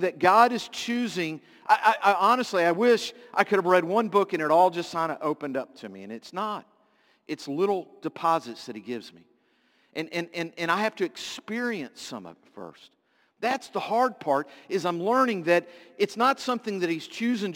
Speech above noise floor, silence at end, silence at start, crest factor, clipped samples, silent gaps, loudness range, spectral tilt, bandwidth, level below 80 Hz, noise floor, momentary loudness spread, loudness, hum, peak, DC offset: 40 dB; 0 s; 0 s; 22 dB; under 0.1%; none; 9 LU; -4.5 dB/octave; 17 kHz; -78 dBFS; -66 dBFS; 17 LU; -25 LUFS; none; -4 dBFS; under 0.1%